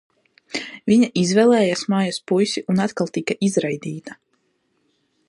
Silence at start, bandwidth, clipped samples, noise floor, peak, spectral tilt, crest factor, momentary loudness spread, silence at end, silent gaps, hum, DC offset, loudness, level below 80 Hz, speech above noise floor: 0.55 s; 11.5 kHz; under 0.1%; -68 dBFS; -4 dBFS; -5.5 dB/octave; 16 dB; 14 LU; 1.15 s; none; none; under 0.1%; -20 LUFS; -64 dBFS; 49 dB